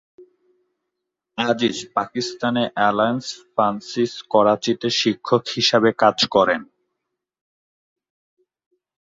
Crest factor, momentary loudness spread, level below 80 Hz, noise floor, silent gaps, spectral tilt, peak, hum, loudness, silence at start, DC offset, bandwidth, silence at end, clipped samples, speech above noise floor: 20 dB; 9 LU; -62 dBFS; -81 dBFS; none; -4 dB/octave; -2 dBFS; none; -20 LUFS; 0.2 s; under 0.1%; 7.8 kHz; 2.45 s; under 0.1%; 61 dB